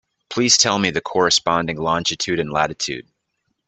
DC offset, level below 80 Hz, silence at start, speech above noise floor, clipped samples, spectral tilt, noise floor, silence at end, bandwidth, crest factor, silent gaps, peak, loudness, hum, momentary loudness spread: under 0.1%; -54 dBFS; 0.3 s; 54 dB; under 0.1%; -2.5 dB/octave; -73 dBFS; 0.65 s; 9 kHz; 20 dB; none; -2 dBFS; -18 LUFS; none; 12 LU